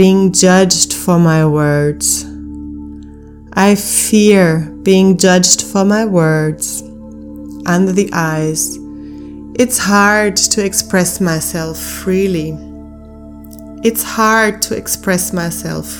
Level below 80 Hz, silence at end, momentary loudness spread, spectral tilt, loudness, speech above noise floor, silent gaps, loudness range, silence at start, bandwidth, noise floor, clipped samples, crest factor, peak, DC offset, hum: -38 dBFS; 0 s; 21 LU; -4 dB/octave; -12 LUFS; 22 dB; none; 6 LU; 0 s; over 20 kHz; -34 dBFS; 0.2%; 14 dB; 0 dBFS; under 0.1%; none